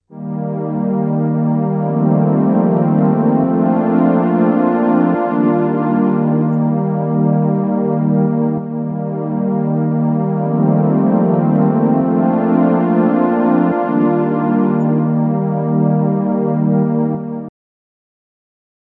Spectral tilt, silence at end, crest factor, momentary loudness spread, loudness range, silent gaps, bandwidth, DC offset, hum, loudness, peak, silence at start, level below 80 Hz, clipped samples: -13 dB/octave; 1.35 s; 14 dB; 5 LU; 3 LU; none; 3.4 kHz; under 0.1%; none; -15 LUFS; -2 dBFS; 0.1 s; -64 dBFS; under 0.1%